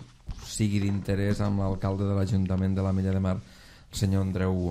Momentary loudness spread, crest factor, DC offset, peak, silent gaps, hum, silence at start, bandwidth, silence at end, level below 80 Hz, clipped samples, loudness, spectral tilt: 8 LU; 14 dB; under 0.1%; -12 dBFS; none; none; 0 s; 13.5 kHz; 0 s; -46 dBFS; under 0.1%; -28 LUFS; -7 dB/octave